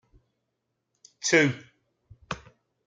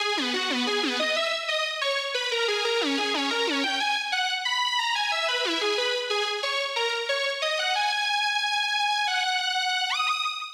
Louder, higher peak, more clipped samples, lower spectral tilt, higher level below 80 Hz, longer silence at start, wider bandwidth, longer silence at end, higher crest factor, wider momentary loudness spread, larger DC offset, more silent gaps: about the same, -23 LUFS vs -24 LUFS; first, -6 dBFS vs -12 dBFS; neither; first, -3.5 dB/octave vs 1 dB/octave; first, -64 dBFS vs -80 dBFS; first, 1.25 s vs 0 s; second, 9.6 kHz vs over 20 kHz; first, 0.5 s vs 0 s; first, 24 dB vs 14 dB; first, 17 LU vs 2 LU; neither; neither